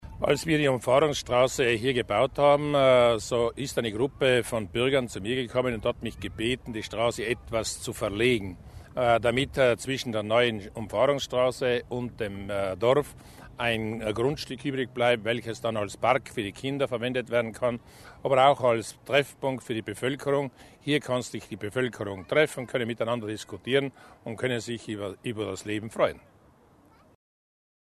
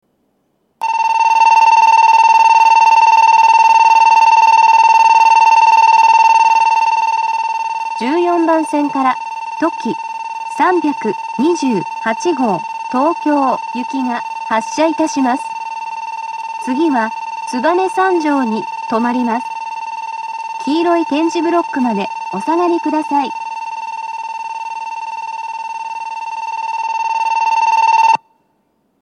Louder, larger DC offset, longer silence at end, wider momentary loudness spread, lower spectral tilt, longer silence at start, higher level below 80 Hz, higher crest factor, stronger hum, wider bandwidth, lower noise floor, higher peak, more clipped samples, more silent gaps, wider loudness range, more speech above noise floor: second, -27 LUFS vs -13 LUFS; neither; first, 1.7 s vs 0.85 s; second, 11 LU vs 15 LU; first, -5 dB/octave vs -3.5 dB/octave; second, 0 s vs 0.8 s; first, -52 dBFS vs -76 dBFS; first, 20 dB vs 12 dB; neither; first, 13.5 kHz vs 10.5 kHz; second, -58 dBFS vs -63 dBFS; second, -6 dBFS vs -2 dBFS; neither; neither; second, 7 LU vs 11 LU; second, 31 dB vs 48 dB